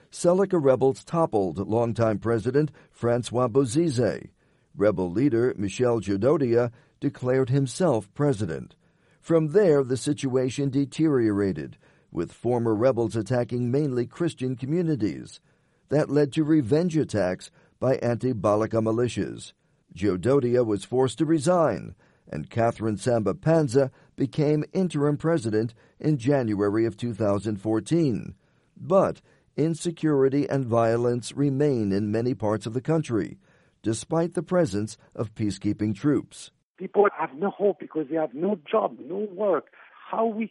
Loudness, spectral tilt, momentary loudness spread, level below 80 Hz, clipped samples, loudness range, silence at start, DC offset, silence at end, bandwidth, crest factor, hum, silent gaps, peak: -25 LUFS; -7 dB/octave; 10 LU; -60 dBFS; under 0.1%; 3 LU; 0.15 s; under 0.1%; 0.05 s; 11.5 kHz; 16 dB; none; 36.63-36.75 s; -8 dBFS